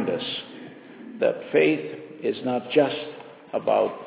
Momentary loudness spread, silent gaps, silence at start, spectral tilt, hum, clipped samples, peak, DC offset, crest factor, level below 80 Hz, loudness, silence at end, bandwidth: 21 LU; none; 0 s; -9 dB/octave; none; under 0.1%; -6 dBFS; under 0.1%; 20 dB; -74 dBFS; -25 LUFS; 0 s; 4 kHz